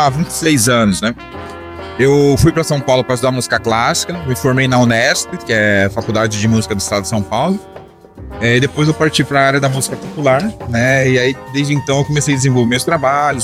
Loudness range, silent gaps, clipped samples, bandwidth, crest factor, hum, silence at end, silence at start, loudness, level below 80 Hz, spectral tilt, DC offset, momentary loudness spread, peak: 2 LU; none; under 0.1%; 16 kHz; 12 dB; none; 0 s; 0 s; -14 LUFS; -38 dBFS; -4.5 dB/octave; under 0.1%; 8 LU; -2 dBFS